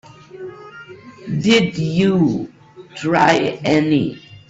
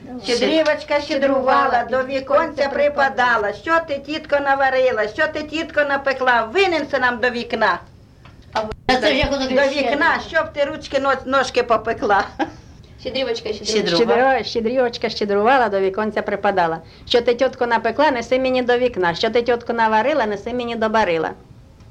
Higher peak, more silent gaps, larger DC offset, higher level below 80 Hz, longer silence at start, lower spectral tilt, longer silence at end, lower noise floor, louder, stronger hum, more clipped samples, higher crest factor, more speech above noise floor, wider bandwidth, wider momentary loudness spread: first, 0 dBFS vs -4 dBFS; neither; neither; second, -52 dBFS vs -44 dBFS; first, 0.35 s vs 0 s; first, -6 dB/octave vs -4 dB/octave; about the same, 0.1 s vs 0.05 s; second, -38 dBFS vs -44 dBFS; about the same, -17 LUFS vs -19 LUFS; neither; neither; about the same, 18 dB vs 14 dB; second, 22 dB vs 26 dB; second, 8 kHz vs 10.5 kHz; first, 21 LU vs 7 LU